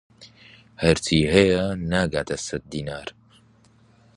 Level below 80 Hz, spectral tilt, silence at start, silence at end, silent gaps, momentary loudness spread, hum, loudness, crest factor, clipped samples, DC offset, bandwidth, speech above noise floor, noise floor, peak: -42 dBFS; -5 dB/octave; 0.2 s; 1.05 s; none; 15 LU; none; -22 LUFS; 24 dB; under 0.1%; under 0.1%; 11.5 kHz; 34 dB; -56 dBFS; 0 dBFS